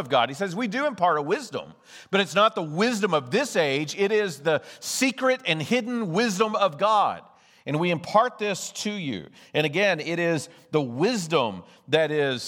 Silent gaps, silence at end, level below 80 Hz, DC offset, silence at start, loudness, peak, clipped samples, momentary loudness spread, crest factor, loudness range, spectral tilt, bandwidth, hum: none; 0 s; -76 dBFS; under 0.1%; 0 s; -24 LUFS; -6 dBFS; under 0.1%; 8 LU; 20 dB; 2 LU; -4 dB/octave; 18 kHz; none